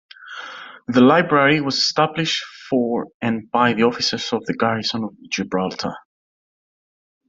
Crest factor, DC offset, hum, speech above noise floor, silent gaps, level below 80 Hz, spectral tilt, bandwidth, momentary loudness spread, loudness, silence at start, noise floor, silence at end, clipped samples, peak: 18 dB; under 0.1%; none; over 71 dB; 3.14-3.20 s; -62 dBFS; -4.5 dB/octave; 7.8 kHz; 19 LU; -19 LUFS; 0.2 s; under -90 dBFS; 1.3 s; under 0.1%; -2 dBFS